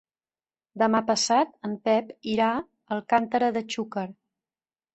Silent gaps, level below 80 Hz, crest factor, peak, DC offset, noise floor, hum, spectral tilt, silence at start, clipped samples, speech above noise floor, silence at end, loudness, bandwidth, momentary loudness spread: none; -68 dBFS; 20 dB; -8 dBFS; under 0.1%; under -90 dBFS; none; -3.5 dB/octave; 0.75 s; under 0.1%; over 65 dB; 0.85 s; -26 LUFS; 8.4 kHz; 11 LU